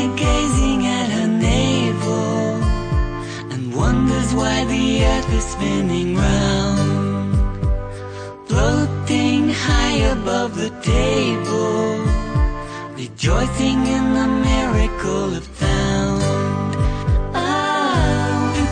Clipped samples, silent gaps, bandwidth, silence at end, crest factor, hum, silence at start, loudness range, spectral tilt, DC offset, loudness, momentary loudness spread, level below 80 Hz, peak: under 0.1%; none; 9.8 kHz; 0 s; 12 dB; none; 0 s; 1 LU; -5.5 dB/octave; under 0.1%; -19 LUFS; 6 LU; -24 dBFS; -4 dBFS